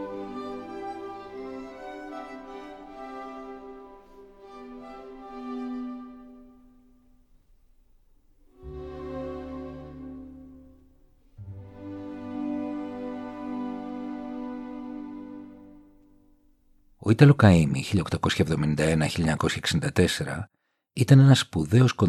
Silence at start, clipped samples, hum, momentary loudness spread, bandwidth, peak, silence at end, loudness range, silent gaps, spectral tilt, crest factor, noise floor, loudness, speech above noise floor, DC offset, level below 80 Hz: 0 s; under 0.1%; none; 25 LU; 12.5 kHz; -4 dBFS; 0 s; 19 LU; none; -6.5 dB/octave; 24 dB; -61 dBFS; -25 LUFS; 41 dB; under 0.1%; -50 dBFS